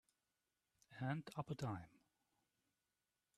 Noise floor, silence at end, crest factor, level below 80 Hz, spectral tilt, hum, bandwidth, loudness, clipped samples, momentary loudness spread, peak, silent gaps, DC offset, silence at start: under -90 dBFS; 1.5 s; 20 dB; -80 dBFS; -7 dB/octave; none; 13 kHz; -48 LUFS; under 0.1%; 16 LU; -32 dBFS; none; under 0.1%; 0.9 s